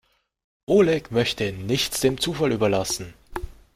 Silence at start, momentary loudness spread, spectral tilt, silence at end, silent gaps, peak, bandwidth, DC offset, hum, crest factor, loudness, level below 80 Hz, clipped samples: 0.7 s; 17 LU; -4.5 dB/octave; 0.25 s; none; -6 dBFS; 16 kHz; under 0.1%; none; 18 dB; -22 LUFS; -46 dBFS; under 0.1%